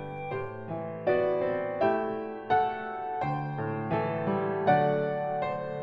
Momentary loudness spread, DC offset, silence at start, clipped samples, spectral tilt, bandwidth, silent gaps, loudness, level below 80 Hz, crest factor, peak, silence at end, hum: 10 LU; under 0.1%; 0 s; under 0.1%; -9.5 dB/octave; 5.8 kHz; none; -30 LUFS; -62 dBFS; 18 dB; -12 dBFS; 0 s; none